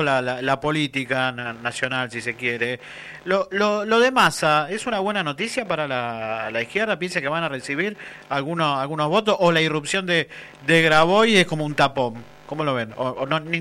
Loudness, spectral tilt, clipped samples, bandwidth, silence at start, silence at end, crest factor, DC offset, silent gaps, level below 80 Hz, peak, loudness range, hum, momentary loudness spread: -21 LUFS; -4.5 dB/octave; under 0.1%; 15 kHz; 0 s; 0 s; 16 dB; under 0.1%; none; -58 dBFS; -6 dBFS; 6 LU; none; 11 LU